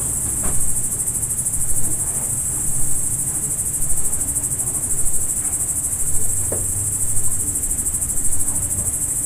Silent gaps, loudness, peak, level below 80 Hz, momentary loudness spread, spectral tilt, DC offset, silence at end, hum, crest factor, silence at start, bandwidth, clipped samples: none; -19 LUFS; -4 dBFS; -32 dBFS; 1 LU; -3 dB/octave; under 0.1%; 0 s; none; 14 dB; 0 s; 16 kHz; under 0.1%